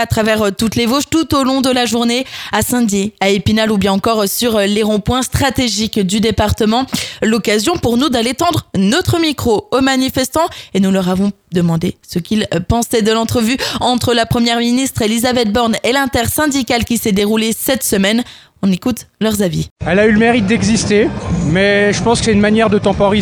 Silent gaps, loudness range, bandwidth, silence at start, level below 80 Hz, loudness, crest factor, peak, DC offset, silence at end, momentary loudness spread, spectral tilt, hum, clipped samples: 19.71-19.76 s; 2 LU; 20 kHz; 0 s; -34 dBFS; -14 LUFS; 14 dB; 0 dBFS; under 0.1%; 0 s; 5 LU; -4.5 dB/octave; none; under 0.1%